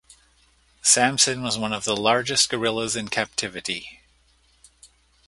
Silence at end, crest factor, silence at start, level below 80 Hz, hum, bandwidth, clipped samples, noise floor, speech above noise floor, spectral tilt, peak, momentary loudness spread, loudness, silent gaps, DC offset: 0.4 s; 24 dB; 0.85 s; -58 dBFS; none; 12 kHz; under 0.1%; -61 dBFS; 38 dB; -1.5 dB/octave; -2 dBFS; 12 LU; -21 LUFS; none; under 0.1%